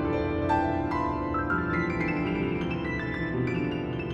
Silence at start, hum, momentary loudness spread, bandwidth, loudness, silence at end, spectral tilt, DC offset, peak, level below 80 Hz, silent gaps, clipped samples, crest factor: 0 s; none; 4 LU; 7.8 kHz; -28 LUFS; 0 s; -8 dB/octave; under 0.1%; -12 dBFS; -44 dBFS; none; under 0.1%; 16 dB